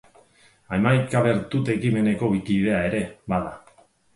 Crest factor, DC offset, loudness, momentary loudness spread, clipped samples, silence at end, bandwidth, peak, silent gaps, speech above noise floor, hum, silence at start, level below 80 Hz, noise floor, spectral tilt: 18 dB; under 0.1%; -23 LUFS; 7 LU; under 0.1%; 0.6 s; 11.5 kHz; -6 dBFS; none; 35 dB; none; 0.7 s; -50 dBFS; -57 dBFS; -7.5 dB/octave